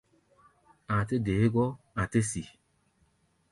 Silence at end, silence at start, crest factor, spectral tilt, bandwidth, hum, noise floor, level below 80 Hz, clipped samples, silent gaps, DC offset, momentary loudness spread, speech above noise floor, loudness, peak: 1 s; 0.9 s; 18 dB; -6.5 dB/octave; 11.5 kHz; none; -70 dBFS; -52 dBFS; under 0.1%; none; under 0.1%; 9 LU; 41 dB; -29 LUFS; -12 dBFS